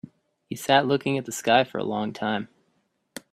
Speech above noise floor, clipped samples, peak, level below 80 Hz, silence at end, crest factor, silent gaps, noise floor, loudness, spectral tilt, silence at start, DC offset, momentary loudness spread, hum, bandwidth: 47 dB; under 0.1%; -4 dBFS; -66 dBFS; 0.85 s; 22 dB; none; -71 dBFS; -24 LUFS; -4.5 dB/octave; 0.5 s; under 0.1%; 20 LU; none; 16 kHz